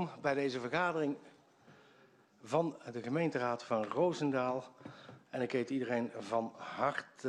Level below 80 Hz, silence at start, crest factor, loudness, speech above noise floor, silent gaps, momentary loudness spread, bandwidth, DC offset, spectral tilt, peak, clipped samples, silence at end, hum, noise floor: -78 dBFS; 0 s; 18 dB; -36 LUFS; 29 dB; none; 11 LU; 11 kHz; under 0.1%; -6 dB/octave; -18 dBFS; under 0.1%; 0 s; none; -65 dBFS